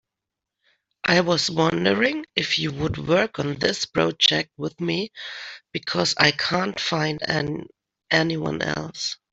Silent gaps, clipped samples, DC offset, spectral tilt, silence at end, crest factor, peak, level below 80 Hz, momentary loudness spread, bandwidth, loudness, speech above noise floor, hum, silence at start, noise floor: none; under 0.1%; under 0.1%; -4 dB/octave; 0.15 s; 22 dB; -2 dBFS; -54 dBFS; 11 LU; 8.2 kHz; -22 LUFS; 62 dB; none; 1.05 s; -85 dBFS